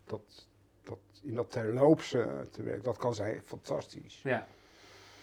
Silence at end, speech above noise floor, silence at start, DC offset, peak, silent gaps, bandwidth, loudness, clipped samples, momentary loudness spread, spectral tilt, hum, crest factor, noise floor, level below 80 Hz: 0 s; 24 dB; 0.05 s; under 0.1%; -12 dBFS; none; 13.5 kHz; -33 LUFS; under 0.1%; 22 LU; -6.5 dB/octave; none; 22 dB; -57 dBFS; -70 dBFS